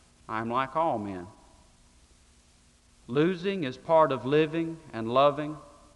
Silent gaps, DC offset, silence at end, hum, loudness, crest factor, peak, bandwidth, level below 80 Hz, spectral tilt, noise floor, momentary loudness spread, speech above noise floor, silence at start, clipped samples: none; under 0.1%; 0.3 s; 60 Hz at -60 dBFS; -28 LUFS; 20 dB; -10 dBFS; 11.5 kHz; -62 dBFS; -7 dB/octave; -61 dBFS; 15 LU; 34 dB; 0.3 s; under 0.1%